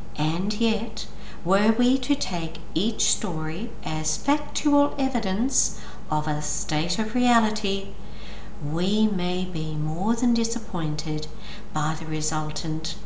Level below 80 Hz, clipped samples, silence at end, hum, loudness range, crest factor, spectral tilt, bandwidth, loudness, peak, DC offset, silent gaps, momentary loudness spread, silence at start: -42 dBFS; under 0.1%; 0 s; none; 2 LU; 18 dB; -4.5 dB/octave; 8 kHz; -25 LUFS; -8 dBFS; 5%; none; 11 LU; 0 s